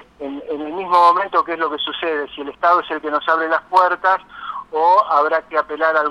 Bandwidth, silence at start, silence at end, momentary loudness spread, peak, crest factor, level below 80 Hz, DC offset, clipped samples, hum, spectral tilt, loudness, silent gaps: 11.5 kHz; 0.2 s; 0 s; 13 LU; 0 dBFS; 18 dB; -60 dBFS; under 0.1%; under 0.1%; none; -4 dB/octave; -17 LUFS; none